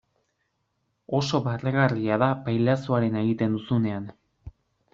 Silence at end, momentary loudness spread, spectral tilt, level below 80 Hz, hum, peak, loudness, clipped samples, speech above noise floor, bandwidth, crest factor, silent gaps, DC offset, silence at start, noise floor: 0.45 s; 6 LU; -6 dB/octave; -58 dBFS; none; -6 dBFS; -25 LUFS; under 0.1%; 51 dB; 7.6 kHz; 20 dB; none; under 0.1%; 1.1 s; -75 dBFS